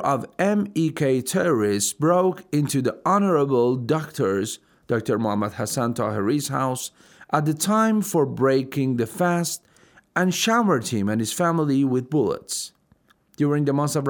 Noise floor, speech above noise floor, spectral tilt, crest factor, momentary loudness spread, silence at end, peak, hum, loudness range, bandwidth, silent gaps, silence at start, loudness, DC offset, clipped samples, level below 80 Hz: -61 dBFS; 39 dB; -5.5 dB/octave; 18 dB; 7 LU; 0 s; -4 dBFS; none; 3 LU; over 20 kHz; none; 0 s; -22 LUFS; under 0.1%; under 0.1%; -66 dBFS